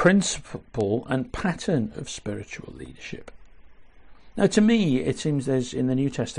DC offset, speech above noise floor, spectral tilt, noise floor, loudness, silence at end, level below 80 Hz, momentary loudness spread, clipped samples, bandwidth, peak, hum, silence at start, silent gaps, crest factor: under 0.1%; 22 dB; -5.5 dB/octave; -46 dBFS; -25 LUFS; 0 s; -48 dBFS; 19 LU; under 0.1%; 10.5 kHz; -6 dBFS; none; 0 s; none; 20 dB